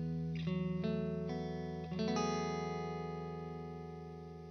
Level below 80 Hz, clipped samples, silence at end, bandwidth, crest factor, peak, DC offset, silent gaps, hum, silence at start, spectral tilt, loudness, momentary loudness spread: -60 dBFS; under 0.1%; 0 s; 6.6 kHz; 16 dB; -22 dBFS; under 0.1%; none; none; 0 s; -6.5 dB/octave; -40 LUFS; 11 LU